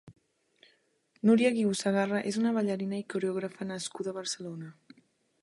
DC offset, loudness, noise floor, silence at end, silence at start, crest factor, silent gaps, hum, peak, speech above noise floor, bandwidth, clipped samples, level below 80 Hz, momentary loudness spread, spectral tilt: under 0.1%; -30 LUFS; -70 dBFS; 0.7 s; 0.05 s; 18 dB; none; none; -14 dBFS; 41 dB; 11.5 kHz; under 0.1%; -76 dBFS; 13 LU; -5 dB/octave